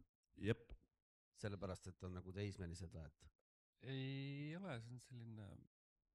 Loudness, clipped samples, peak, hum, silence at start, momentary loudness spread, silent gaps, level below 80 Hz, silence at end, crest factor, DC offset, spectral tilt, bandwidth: -51 LUFS; under 0.1%; -28 dBFS; none; 0 s; 14 LU; 0.09-0.23 s, 1.02-1.32 s, 3.35-3.73 s; -70 dBFS; 0.5 s; 24 dB; under 0.1%; -6.5 dB/octave; 12 kHz